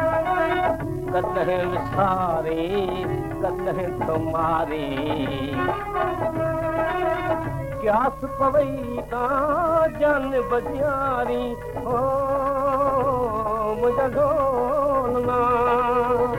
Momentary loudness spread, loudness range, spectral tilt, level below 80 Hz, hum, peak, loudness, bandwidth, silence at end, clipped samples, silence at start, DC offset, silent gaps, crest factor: 6 LU; 3 LU; -7 dB/octave; -42 dBFS; none; -8 dBFS; -23 LUFS; 16.5 kHz; 0 s; under 0.1%; 0 s; under 0.1%; none; 14 dB